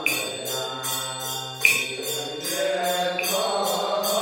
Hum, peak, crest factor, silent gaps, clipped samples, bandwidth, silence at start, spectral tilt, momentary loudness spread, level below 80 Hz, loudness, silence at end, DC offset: none; -2 dBFS; 22 dB; none; under 0.1%; 17 kHz; 0 s; -1.5 dB/octave; 9 LU; -68 dBFS; -24 LUFS; 0 s; under 0.1%